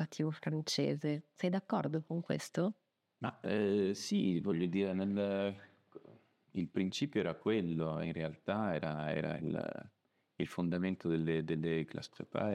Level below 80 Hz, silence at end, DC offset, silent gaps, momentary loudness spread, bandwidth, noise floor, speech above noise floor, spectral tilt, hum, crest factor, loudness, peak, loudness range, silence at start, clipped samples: -74 dBFS; 0 s; under 0.1%; none; 8 LU; 13.5 kHz; -63 dBFS; 27 dB; -6.5 dB/octave; none; 18 dB; -37 LUFS; -18 dBFS; 2 LU; 0 s; under 0.1%